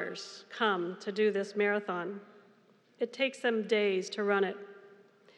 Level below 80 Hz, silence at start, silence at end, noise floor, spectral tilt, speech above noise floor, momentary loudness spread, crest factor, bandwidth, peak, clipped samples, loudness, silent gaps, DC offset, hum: under -90 dBFS; 0 s; 0.45 s; -64 dBFS; -4.5 dB/octave; 33 dB; 14 LU; 18 dB; 10.5 kHz; -14 dBFS; under 0.1%; -32 LUFS; none; under 0.1%; none